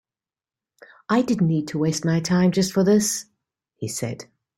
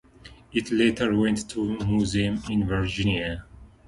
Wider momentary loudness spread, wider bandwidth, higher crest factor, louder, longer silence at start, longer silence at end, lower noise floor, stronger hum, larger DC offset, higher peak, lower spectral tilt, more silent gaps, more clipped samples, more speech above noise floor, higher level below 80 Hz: first, 12 LU vs 8 LU; first, 16.5 kHz vs 11.5 kHz; about the same, 16 dB vs 16 dB; first, -22 LUFS vs -25 LUFS; first, 1.1 s vs 0.25 s; first, 0.35 s vs 0.2 s; first, under -90 dBFS vs -49 dBFS; neither; neither; about the same, -8 dBFS vs -8 dBFS; about the same, -5.5 dB/octave vs -5.5 dB/octave; neither; neither; first, over 69 dB vs 25 dB; second, -60 dBFS vs -42 dBFS